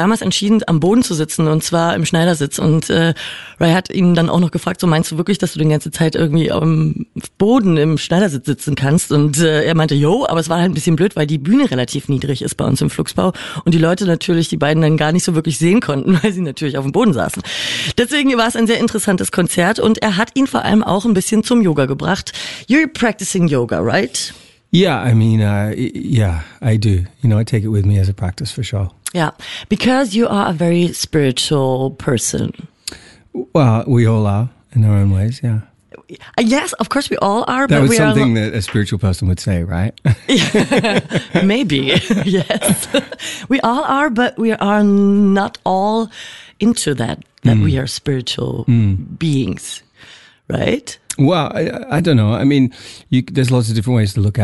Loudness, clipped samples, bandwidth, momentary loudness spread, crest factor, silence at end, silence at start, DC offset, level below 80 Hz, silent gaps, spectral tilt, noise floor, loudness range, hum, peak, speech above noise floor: -15 LUFS; under 0.1%; 12 kHz; 7 LU; 14 dB; 0 s; 0 s; 0.4%; -42 dBFS; none; -5.5 dB/octave; -43 dBFS; 3 LU; none; -2 dBFS; 28 dB